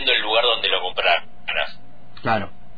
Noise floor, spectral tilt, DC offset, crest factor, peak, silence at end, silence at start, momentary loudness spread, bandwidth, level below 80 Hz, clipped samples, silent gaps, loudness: -47 dBFS; -5 dB/octave; 3%; 16 dB; -6 dBFS; 0.3 s; 0 s; 8 LU; 5 kHz; -50 dBFS; under 0.1%; none; -20 LUFS